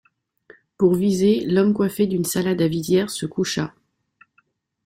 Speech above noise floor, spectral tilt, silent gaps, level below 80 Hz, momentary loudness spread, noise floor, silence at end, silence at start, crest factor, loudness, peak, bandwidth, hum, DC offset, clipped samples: 45 dB; -6 dB/octave; none; -56 dBFS; 7 LU; -65 dBFS; 1.2 s; 0.8 s; 16 dB; -20 LUFS; -6 dBFS; 16.5 kHz; none; under 0.1%; under 0.1%